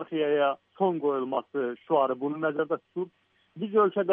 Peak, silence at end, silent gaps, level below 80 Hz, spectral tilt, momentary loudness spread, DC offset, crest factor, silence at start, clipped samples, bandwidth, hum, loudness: -12 dBFS; 0 s; none; -84 dBFS; -9.5 dB/octave; 10 LU; under 0.1%; 16 dB; 0 s; under 0.1%; 3.7 kHz; none; -28 LUFS